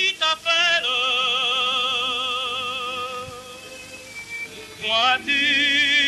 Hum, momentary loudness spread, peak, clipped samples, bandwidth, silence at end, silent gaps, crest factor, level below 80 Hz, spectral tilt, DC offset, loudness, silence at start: 50 Hz at -55 dBFS; 19 LU; -8 dBFS; under 0.1%; 13.5 kHz; 0 s; none; 16 dB; -60 dBFS; -0.5 dB/octave; under 0.1%; -19 LUFS; 0 s